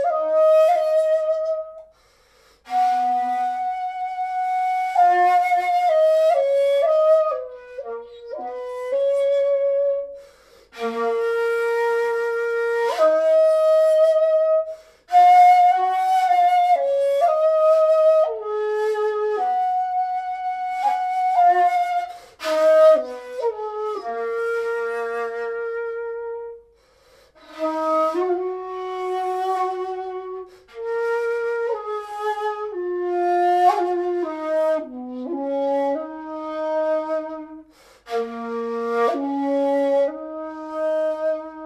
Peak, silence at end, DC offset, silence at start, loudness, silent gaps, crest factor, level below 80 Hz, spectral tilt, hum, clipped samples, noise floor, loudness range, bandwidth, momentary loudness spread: -6 dBFS; 0 s; under 0.1%; 0 s; -20 LUFS; none; 14 dB; -66 dBFS; -3.5 dB/octave; none; under 0.1%; -57 dBFS; 10 LU; 13.5 kHz; 14 LU